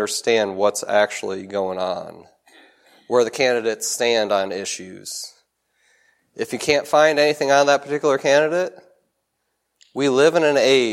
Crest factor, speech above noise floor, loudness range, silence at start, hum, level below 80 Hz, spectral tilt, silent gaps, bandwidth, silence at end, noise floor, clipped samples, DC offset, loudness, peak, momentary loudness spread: 18 dB; 55 dB; 4 LU; 0 s; none; -68 dBFS; -3 dB/octave; none; 16 kHz; 0 s; -74 dBFS; under 0.1%; under 0.1%; -19 LUFS; -2 dBFS; 15 LU